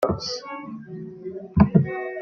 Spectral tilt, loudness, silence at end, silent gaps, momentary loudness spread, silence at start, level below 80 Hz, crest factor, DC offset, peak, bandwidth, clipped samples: -7 dB/octave; -22 LUFS; 0 s; none; 18 LU; 0 s; -42 dBFS; 22 dB; under 0.1%; -2 dBFS; 7 kHz; under 0.1%